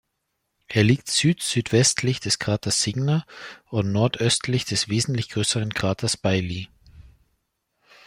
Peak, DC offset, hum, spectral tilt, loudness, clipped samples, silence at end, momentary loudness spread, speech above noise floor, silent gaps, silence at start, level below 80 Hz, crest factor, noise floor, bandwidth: -4 dBFS; under 0.1%; none; -4 dB/octave; -22 LUFS; under 0.1%; 1.05 s; 8 LU; 54 dB; none; 0.7 s; -54 dBFS; 20 dB; -77 dBFS; 16 kHz